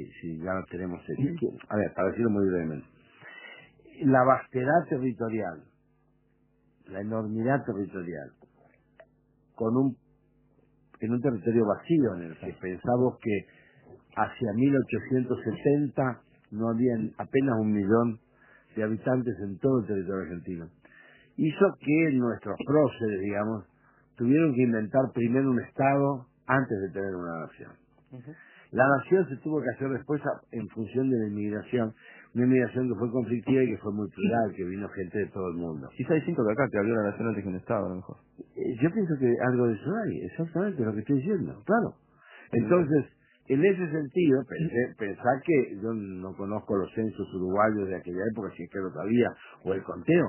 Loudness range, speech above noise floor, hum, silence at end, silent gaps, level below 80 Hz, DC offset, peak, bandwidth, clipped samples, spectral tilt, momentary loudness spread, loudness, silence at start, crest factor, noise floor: 4 LU; 40 dB; none; 0 s; none; -60 dBFS; under 0.1%; -8 dBFS; 3.2 kHz; under 0.1%; -7.5 dB/octave; 13 LU; -28 LUFS; 0 s; 20 dB; -68 dBFS